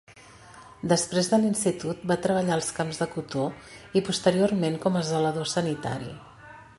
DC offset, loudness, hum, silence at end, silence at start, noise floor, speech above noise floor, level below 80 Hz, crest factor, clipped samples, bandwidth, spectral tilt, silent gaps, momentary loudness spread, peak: under 0.1%; -26 LUFS; none; 0.15 s; 0.1 s; -50 dBFS; 24 dB; -60 dBFS; 20 dB; under 0.1%; 11.5 kHz; -5 dB/octave; none; 11 LU; -8 dBFS